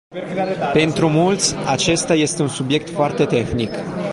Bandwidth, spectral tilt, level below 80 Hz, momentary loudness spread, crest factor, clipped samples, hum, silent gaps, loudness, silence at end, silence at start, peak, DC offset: 11.5 kHz; -4.5 dB/octave; -46 dBFS; 7 LU; 16 dB; under 0.1%; none; none; -18 LUFS; 0 s; 0.1 s; -4 dBFS; under 0.1%